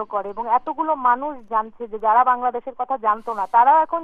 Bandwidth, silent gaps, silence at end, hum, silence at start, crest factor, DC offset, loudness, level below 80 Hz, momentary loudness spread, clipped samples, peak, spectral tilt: 3.8 kHz; none; 0 s; none; 0 s; 14 dB; under 0.1%; -20 LUFS; -58 dBFS; 11 LU; under 0.1%; -6 dBFS; -6 dB/octave